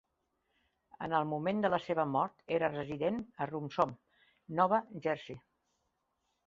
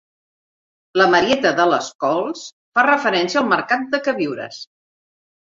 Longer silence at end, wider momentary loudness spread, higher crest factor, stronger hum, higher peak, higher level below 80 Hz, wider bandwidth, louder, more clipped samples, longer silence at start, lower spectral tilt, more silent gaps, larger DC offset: first, 1.1 s vs 0.8 s; second, 9 LU vs 13 LU; about the same, 22 dB vs 18 dB; neither; second, -14 dBFS vs -2 dBFS; second, -72 dBFS vs -60 dBFS; about the same, 7.6 kHz vs 7.8 kHz; second, -34 LUFS vs -18 LUFS; neither; about the same, 1 s vs 0.95 s; about the same, -5 dB/octave vs -4 dB/octave; second, none vs 1.95-1.99 s, 2.52-2.72 s; neither